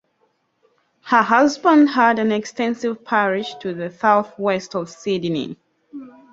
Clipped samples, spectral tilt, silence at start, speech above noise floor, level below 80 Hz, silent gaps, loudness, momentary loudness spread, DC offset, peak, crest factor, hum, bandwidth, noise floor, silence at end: under 0.1%; -5 dB/octave; 1.05 s; 48 dB; -66 dBFS; none; -19 LUFS; 14 LU; under 0.1%; -2 dBFS; 18 dB; none; 7.8 kHz; -66 dBFS; 0.25 s